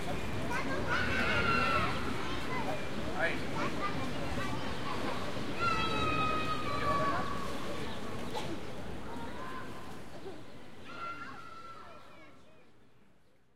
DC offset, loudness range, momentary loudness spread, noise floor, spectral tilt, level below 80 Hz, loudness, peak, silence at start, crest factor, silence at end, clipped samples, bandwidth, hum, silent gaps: 2%; 13 LU; 17 LU; -67 dBFS; -5 dB/octave; -52 dBFS; -35 LUFS; -16 dBFS; 0 s; 18 dB; 0 s; under 0.1%; 16.5 kHz; none; none